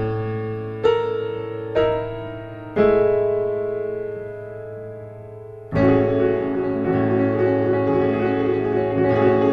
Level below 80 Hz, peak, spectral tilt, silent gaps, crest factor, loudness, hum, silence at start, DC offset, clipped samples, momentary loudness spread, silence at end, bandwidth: -46 dBFS; -6 dBFS; -9.5 dB/octave; none; 16 dB; -21 LUFS; none; 0 s; under 0.1%; under 0.1%; 16 LU; 0 s; 6 kHz